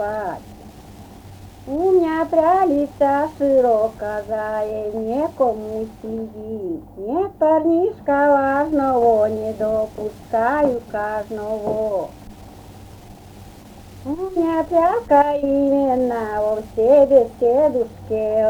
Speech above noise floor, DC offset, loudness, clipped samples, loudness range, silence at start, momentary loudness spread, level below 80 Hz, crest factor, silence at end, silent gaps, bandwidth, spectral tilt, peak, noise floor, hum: 22 dB; under 0.1%; -19 LUFS; under 0.1%; 8 LU; 0 s; 13 LU; -46 dBFS; 16 dB; 0 s; none; 20 kHz; -7.5 dB/octave; -2 dBFS; -41 dBFS; none